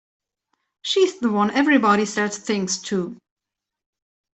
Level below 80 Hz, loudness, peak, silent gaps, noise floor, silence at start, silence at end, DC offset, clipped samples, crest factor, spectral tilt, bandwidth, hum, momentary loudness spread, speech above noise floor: -66 dBFS; -20 LUFS; -4 dBFS; none; -74 dBFS; 0.85 s; 1.2 s; under 0.1%; under 0.1%; 18 dB; -4 dB/octave; 8.4 kHz; none; 10 LU; 54 dB